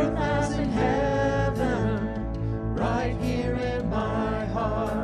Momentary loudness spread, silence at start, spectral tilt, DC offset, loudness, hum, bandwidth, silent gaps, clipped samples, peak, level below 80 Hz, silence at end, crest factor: 5 LU; 0 s; -7 dB/octave; under 0.1%; -26 LUFS; none; 12.5 kHz; none; under 0.1%; -12 dBFS; -36 dBFS; 0 s; 14 dB